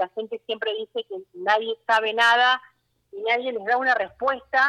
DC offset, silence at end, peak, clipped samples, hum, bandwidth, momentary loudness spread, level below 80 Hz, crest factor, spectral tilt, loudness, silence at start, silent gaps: under 0.1%; 0 s; -6 dBFS; under 0.1%; none; 12.5 kHz; 13 LU; -70 dBFS; 16 dB; -1.5 dB/octave; -23 LUFS; 0 s; none